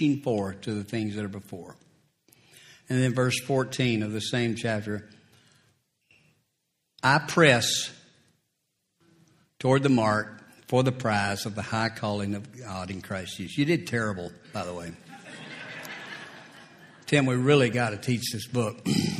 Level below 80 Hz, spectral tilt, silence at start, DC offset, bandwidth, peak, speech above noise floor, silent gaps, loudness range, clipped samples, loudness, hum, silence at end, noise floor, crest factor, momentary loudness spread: -64 dBFS; -5 dB/octave; 0 s; under 0.1%; 15.5 kHz; -4 dBFS; 52 dB; none; 6 LU; under 0.1%; -27 LUFS; none; 0 s; -78 dBFS; 24 dB; 18 LU